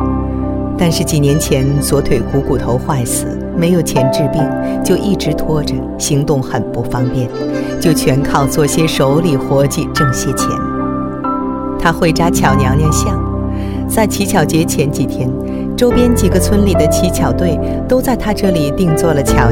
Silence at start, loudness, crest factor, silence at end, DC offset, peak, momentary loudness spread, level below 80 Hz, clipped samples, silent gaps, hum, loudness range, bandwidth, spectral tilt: 0 s; -14 LUFS; 12 dB; 0 s; under 0.1%; 0 dBFS; 7 LU; -26 dBFS; under 0.1%; none; none; 2 LU; 17.5 kHz; -5.5 dB/octave